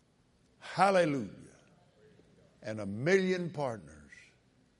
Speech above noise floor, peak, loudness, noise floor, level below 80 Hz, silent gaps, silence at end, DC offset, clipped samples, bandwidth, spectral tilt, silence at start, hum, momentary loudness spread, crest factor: 38 dB; -12 dBFS; -31 LUFS; -68 dBFS; -72 dBFS; none; 0.8 s; under 0.1%; under 0.1%; 11.5 kHz; -6 dB/octave; 0.65 s; none; 22 LU; 24 dB